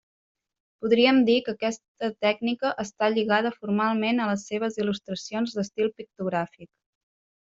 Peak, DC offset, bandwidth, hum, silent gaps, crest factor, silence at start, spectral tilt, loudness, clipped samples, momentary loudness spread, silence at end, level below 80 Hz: -8 dBFS; under 0.1%; 7.8 kHz; none; 1.88-1.95 s; 20 dB; 0.8 s; -5 dB/octave; -25 LUFS; under 0.1%; 11 LU; 0.85 s; -70 dBFS